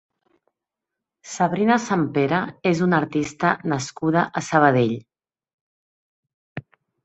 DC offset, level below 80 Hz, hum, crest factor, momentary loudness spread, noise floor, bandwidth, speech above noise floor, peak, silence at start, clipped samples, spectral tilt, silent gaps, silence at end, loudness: under 0.1%; -62 dBFS; none; 20 dB; 18 LU; -85 dBFS; 8.2 kHz; 65 dB; -2 dBFS; 1.25 s; under 0.1%; -6 dB/octave; 5.54-6.23 s, 6.34-6.56 s; 0.45 s; -21 LUFS